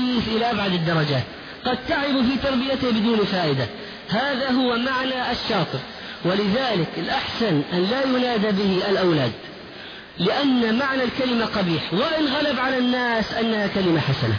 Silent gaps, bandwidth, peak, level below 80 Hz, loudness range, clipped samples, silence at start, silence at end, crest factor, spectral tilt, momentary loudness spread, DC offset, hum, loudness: none; 5.4 kHz; -10 dBFS; -50 dBFS; 2 LU; under 0.1%; 0 s; 0 s; 12 dB; -6.5 dB/octave; 7 LU; under 0.1%; none; -22 LUFS